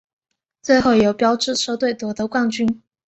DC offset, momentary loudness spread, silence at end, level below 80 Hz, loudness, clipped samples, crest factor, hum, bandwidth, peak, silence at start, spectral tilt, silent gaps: under 0.1%; 8 LU; 0.3 s; -52 dBFS; -18 LUFS; under 0.1%; 16 dB; none; 8.4 kHz; -4 dBFS; 0.65 s; -4 dB/octave; none